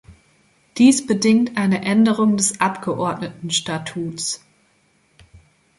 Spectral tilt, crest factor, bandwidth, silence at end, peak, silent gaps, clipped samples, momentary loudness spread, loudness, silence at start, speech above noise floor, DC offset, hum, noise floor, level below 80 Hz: -4 dB/octave; 18 dB; 11.5 kHz; 1.4 s; -2 dBFS; none; under 0.1%; 12 LU; -19 LUFS; 0.1 s; 42 dB; under 0.1%; none; -60 dBFS; -58 dBFS